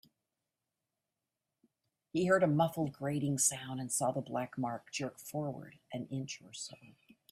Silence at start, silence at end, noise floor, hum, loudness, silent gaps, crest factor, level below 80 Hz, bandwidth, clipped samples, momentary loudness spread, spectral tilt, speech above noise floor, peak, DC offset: 2.15 s; 0.45 s; -89 dBFS; none; -35 LUFS; none; 22 dB; -74 dBFS; 15.5 kHz; under 0.1%; 15 LU; -4.5 dB/octave; 54 dB; -14 dBFS; under 0.1%